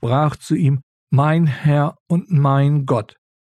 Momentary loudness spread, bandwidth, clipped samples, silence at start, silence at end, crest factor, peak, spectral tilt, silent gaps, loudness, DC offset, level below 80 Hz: 7 LU; 9.8 kHz; under 0.1%; 0 s; 0.4 s; 10 dB; -6 dBFS; -8.5 dB/octave; 0.83-1.07 s, 2.00-2.06 s; -18 LUFS; under 0.1%; -54 dBFS